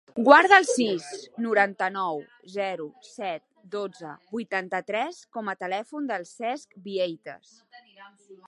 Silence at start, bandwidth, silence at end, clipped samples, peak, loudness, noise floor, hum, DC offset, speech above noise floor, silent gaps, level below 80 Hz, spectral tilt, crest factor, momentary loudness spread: 0.15 s; 11.5 kHz; 0.15 s; under 0.1%; 0 dBFS; -25 LUFS; -51 dBFS; none; under 0.1%; 25 dB; none; -78 dBFS; -3.5 dB/octave; 26 dB; 20 LU